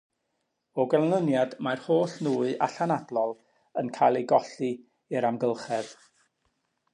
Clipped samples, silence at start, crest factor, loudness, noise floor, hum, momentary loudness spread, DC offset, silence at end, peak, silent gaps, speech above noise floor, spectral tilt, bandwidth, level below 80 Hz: under 0.1%; 0.75 s; 20 dB; -27 LUFS; -79 dBFS; none; 10 LU; under 0.1%; 1 s; -8 dBFS; none; 52 dB; -6.5 dB/octave; 11 kHz; -80 dBFS